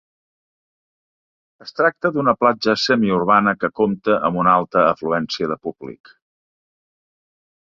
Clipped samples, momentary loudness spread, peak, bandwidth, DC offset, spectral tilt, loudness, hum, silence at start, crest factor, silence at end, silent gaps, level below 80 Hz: under 0.1%; 11 LU; -2 dBFS; 7.6 kHz; under 0.1%; -6 dB/octave; -18 LUFS; none; 1.65 s; 20 dB; 1.8 s; none; -58 dBFS